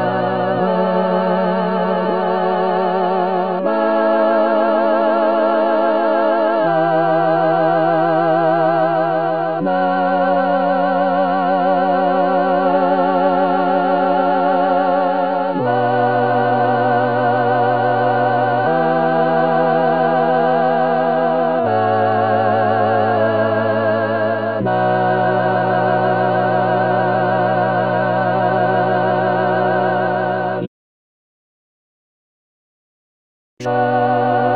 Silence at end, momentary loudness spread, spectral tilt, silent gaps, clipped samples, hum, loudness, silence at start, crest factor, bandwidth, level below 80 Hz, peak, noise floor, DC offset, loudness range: 0 s; 3 LU; -9 dB/octave; 30.68-33.57 s; under 0.1%; none; -16 LUFS; 0 s; 12 dB; 5 kHz; -70 dBFS; -2 dBFS; under -90 dBFS; 0.8%; 2 LU